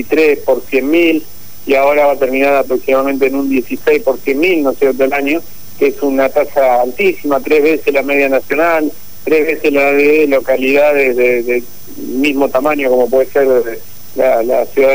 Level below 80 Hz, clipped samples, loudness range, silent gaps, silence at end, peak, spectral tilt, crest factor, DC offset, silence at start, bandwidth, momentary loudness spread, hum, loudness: -50 dBFS; under 0.1%; 2 LU; none; 0 s; 0 dBFS; -4.5 dB/octave; 12 dB; 5%; 0 s; 16 kHz; 6 LU; none; -12 LUFS